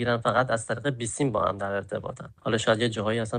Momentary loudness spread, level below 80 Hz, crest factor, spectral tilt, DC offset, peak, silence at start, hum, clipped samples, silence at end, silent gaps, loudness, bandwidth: 10 LU; -58 dBFS; 18 dB; -5 dB/octave; under 0.1%; -10 dBFS; 0 s; none; under 0.1%; 0 s; none; -27 LUFS; 10 kHz